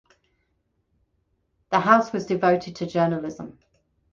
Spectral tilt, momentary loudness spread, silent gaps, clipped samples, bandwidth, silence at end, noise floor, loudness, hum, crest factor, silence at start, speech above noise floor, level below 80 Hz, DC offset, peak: -6.5 dB/octave; 17 LU; none; under 0.1%; 7.4 kHz; 0.6 s; -72 dBFS; -22 LUFS; none; 24 dB; 1.7 s; 50 dB; -62 dBFS; under 0.1%; -2 dBFS